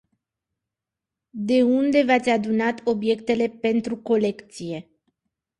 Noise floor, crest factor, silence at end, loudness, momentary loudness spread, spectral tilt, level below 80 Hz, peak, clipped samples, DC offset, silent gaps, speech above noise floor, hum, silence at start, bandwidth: -87 dBFS; 18 dB; 0.8 s; -22 LUFS; 15 LU; -6 dB/octave; -64 dBFS; -6 dBFS; under 0.1%; under 0.1%; none; 65 dB; none; 1.35 s; 11 kHz